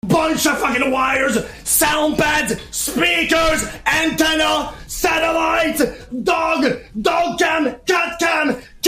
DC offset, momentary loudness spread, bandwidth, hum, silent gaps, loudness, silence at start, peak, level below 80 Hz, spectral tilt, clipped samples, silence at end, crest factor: under 0.1%; 6 LU; 16 kHz; none; none; -17 LUFS; 0.05 s; -2 dBFS; -40 dBFS; -2.5 dB/octave; under 0.1%; 0 s; 16 dB